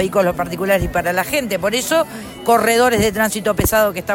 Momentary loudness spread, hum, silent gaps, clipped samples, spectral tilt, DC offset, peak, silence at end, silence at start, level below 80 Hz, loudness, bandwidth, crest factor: 5 LU; none; none; under 0.1%; -4 dB/octave; under 0.1%; -4 dBFS; 0 s; 0 s; -36 dBFS; -17 LUFS; 16.5 kHz; 14 dB